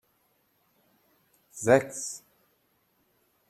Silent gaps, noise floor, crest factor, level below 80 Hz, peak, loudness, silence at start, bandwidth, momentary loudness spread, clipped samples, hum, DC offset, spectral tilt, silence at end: none; -71 dBFS; 24 dB; -70 dBFS; -8 dBFS; -26 LUFS; 1.55 s; 14 kHz; 21 LU; under 0.1%; none; under 0.1%; -4.5 dB/octave; 1.3 s